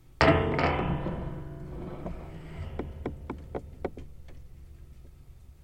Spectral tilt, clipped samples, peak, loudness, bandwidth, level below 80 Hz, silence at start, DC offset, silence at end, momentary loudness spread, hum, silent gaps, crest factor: -7 dB/octave; under 0.1%; -6 dBFS; -31 LUFS; 9.2 kHz; -42 dBFS; 0.1 s; under 0.1%; 0.1 s; 27 LU; none; none; 26 dB